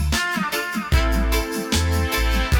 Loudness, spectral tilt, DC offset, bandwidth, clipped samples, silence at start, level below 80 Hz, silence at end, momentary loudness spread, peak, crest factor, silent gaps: -21 LUFS; -4.5 dB/octave; under 0.1%; 18.5 kHz; under 0.1%; 0 s; -24 dBFS; 0 s; 3 LU; -6 dBFS; 14 dB; none